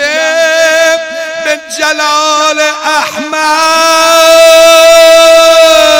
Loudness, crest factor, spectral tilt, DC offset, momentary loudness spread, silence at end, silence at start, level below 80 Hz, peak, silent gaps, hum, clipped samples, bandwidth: -5 LUFS; 6 dB; 0.5 dB/octave; under 0.1%; 11 LU; 0 s; 0 s; -42 dBFS; 0 dBFS; none; none; 10%; over 20 kHz